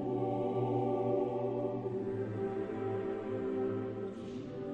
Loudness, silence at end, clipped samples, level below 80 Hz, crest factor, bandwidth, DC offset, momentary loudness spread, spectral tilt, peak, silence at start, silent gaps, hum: -36 LUFS; 0 s; under 0.1%; -66 dBFS; 14 dB; 7 kHz; under 0.1%; 8 LU; -9.5 dB/octave; -22 dBFS; 0 s; none; none